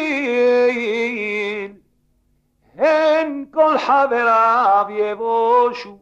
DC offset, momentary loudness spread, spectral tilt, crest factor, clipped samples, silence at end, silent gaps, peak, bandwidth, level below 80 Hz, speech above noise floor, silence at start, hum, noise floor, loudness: under 0.1%; 8 LU; -4.5 dB/octave; 14 dB; under 0.1%; 0.05 s; none; -4 dBFS; 7.8 kHz; -62 dBFS; 47 dB; 0 s; none; -63 dBFS; -17 LUFS